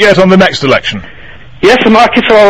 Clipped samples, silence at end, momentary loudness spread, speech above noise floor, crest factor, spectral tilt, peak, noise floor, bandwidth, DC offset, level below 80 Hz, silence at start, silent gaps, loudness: 4%; 0 s; 8 LU; 26 dB; 6 dB; -5.5 dB/octave; 0 dBFS; -32 dBFS; 12 kHz; 3%; -36 dBFS; 0 s; none; -6 LUFS